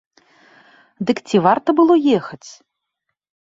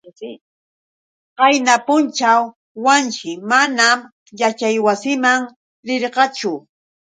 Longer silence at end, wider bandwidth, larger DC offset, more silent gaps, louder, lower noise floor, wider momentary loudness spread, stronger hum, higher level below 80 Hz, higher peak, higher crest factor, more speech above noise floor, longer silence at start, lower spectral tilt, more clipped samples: first, 1 s vs 0.45 s; second, 7.8 kHz vs 9.6 kHz; neither; second, none vs 0.41-1.36 s, 2.56-2.75 s, 4.12-4.26 s, 5.56-5.83 s; about the same, -16 LUFS vs -16 LUFS; second, -77 dBFS vs under -90 dBFS; about the same, 16 LU vs 15 LU; neither; first, -64 dBFS vs -72 dBFS; about the same, -2 dBFS vs 0 dBFS; about the same, 18 dB vs 18 dB; second, 61 dB vs over 74 dB; first, 1 s vs 0.2 s; first, -6.5 dB/octave vs -2 dB/octave; neither